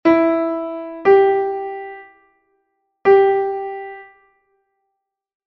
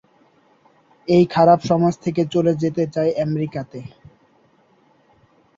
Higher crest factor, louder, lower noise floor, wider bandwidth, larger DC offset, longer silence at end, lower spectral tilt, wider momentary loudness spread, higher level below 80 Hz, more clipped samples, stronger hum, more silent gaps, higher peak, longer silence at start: about the same, 18 dB vs 18 dB; about the same, -17 LUFS vs -18 LUFS; first, -77 dBFS vs -57 dBFS; second, 5.8 kHz vs 7.6 kHz; neither; second, 1.45 s vs 1.7 s; about the same, -7.5 dB/octave vs -8 dB/octave; about the same, 21 LU vs 20 LU; about the same, -60 dBFS vs -58 dBFS; neither; neither; neither; about the same, -2 dBFS vs -2 dBFS; second, 0.05 s vs 1.1 s